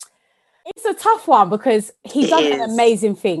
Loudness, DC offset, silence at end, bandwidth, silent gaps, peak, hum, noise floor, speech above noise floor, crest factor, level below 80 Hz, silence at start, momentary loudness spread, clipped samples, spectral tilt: -17 LUFS; under 0.1%; 0 s; 12.5 kHz; none; 0 dBFS; none; -63 dBFS; 47 dB; 16 dB; -68 dBFS; 0 s; 11 LU; under 0.1%; -4.5 dB/octave